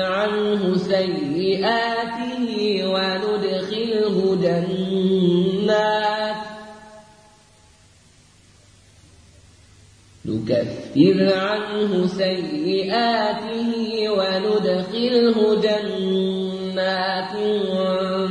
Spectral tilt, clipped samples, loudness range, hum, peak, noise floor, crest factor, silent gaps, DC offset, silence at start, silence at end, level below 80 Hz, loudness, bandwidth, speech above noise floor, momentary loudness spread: -6.5 dB/octave; under 0.1%; 5 LU; none; -4 dBFS; -52 dBFS; 18 dB; none; under 0.1%; 0 s; 0 s; -60 dBFS; -21 LUFS; 10.5 kHz; 32 dB; 7 LU